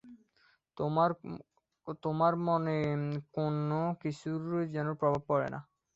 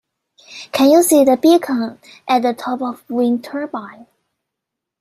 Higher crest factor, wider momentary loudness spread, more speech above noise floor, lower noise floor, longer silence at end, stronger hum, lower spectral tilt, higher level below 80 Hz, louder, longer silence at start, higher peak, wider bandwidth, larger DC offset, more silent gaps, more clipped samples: about the same, 18 dB vs 16 dB; second, 13 LU vs 16 LU; second, 38 dB vs 66 dB; second, -70 dBFS vs -81 dBFS; second, 0.35 s vs 1.1 s; neither; first, -8.5 dB/octave vs -3.5 dB/octave; about the same, -68 dBFS vs -64 dBFS; second, -33 LUFS vs -15 LUFS; second, 0.05 s vs 0.5 s; second, -16 dBFS vs -2 dBFS; second, 7.8 kHz vs 16 kHz; neither; neither; neither